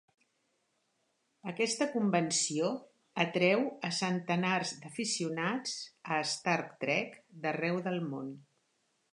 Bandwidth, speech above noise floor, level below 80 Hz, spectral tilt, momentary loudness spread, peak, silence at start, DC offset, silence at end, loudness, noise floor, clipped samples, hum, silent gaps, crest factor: 11.5 kHz; 45 dB; -84 dBFS; -4 dB/octave; 12 LU; -14 dBFS; 1.45 s; under 0.1%; 0.7 s; -33 LUFS; -78 dBFS; under 0.1%; none; none; 22 dB